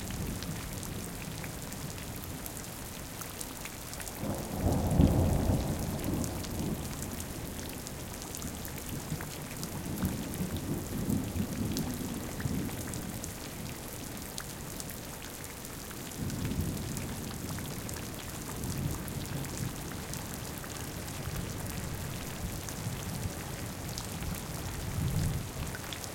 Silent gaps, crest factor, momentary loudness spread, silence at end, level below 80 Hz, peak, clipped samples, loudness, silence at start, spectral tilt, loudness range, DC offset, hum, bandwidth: none; 26 dB; 8 LU; 0 s; -46 dBFS; -10 dBFS; under 0.1%; -36 LUFS; 0 s; -5 dB/octave; 8 LU; under 0.1%; none; 17 kHz